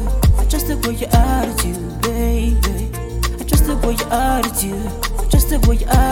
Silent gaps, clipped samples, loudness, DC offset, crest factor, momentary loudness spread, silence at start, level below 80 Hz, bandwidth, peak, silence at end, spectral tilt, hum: none; under 0.1%; -18 LUFS; under 0.1%; 14 dB; 7 LU; 0 s; -18 dBFS; 17.5 kHz; 0 dBFS; 0 s; -5 dB/octave; none